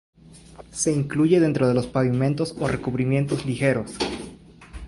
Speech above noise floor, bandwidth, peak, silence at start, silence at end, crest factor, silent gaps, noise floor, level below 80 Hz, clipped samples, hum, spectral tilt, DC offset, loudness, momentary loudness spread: 22 dB; 11.5 kHz; -6 dBFS; 0.35 s; 0 s; 16 dB; none; -44 dBFS; -48 dBFS; under 0.1%; none; -6 dB/octave; under 0.1%; -23 LUFS; 10 LU